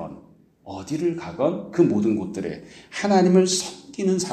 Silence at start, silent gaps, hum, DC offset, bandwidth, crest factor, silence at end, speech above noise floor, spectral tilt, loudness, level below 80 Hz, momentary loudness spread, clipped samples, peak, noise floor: 0 s; none; none; under 0.1%; 14 kHz; 16 dB; 0 s; 29 dB; -5.5 dB/octave; -22 LUFS; -60 dBFS; 18 LU; under 0.1%; -6 dBFS; -51 dBFS